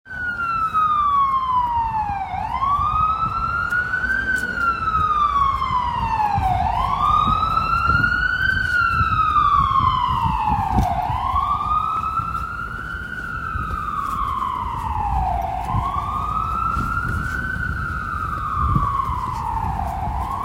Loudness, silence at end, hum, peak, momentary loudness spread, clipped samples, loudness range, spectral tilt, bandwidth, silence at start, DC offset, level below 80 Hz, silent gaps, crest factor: -20 LUFS; 0 s; none; -4 dBFS; 8 LU; under 0.1%; 6 LU; -5.5 dB/octave; 16 kHz; 0.05 s; under 0.1%; -32 dBFS; none; 16 dB